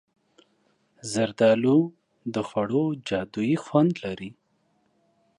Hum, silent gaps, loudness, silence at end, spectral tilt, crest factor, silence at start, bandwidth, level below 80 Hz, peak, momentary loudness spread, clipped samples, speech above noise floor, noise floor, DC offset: none; none; -25 LUFS; 1.05 s; -6.5 dB/octave; 18 dB; 1.05 s; 11.5 kHz; -64 dBFS; -8 dBFS; 15 LU; under 0.1%; 45 dB; -69 dBFS; under 0.1%